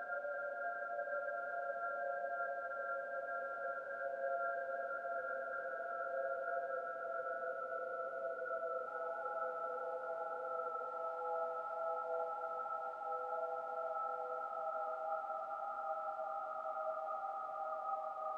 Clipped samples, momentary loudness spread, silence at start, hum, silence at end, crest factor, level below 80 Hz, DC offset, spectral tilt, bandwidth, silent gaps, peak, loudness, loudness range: under 0.1%; 2 LU; 0 s; none; 0 s; 14 dB; under -90 dBFS; under 0.1%; -4.5 dB/octave; 7.8 kHz; none; -28 dBFS; -42 LUFS; 1 LU